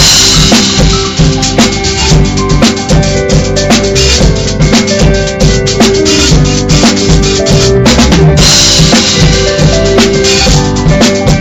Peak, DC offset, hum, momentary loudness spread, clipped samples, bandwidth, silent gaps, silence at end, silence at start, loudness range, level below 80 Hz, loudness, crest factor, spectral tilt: 0 dBFS; under 0.1%; none; 5 LU; 2%; over 20 kHz; none; 0 s; 0 s; 3 LU; -14 dBFS; -6 LUFS; 6 dB; -4 dB/octave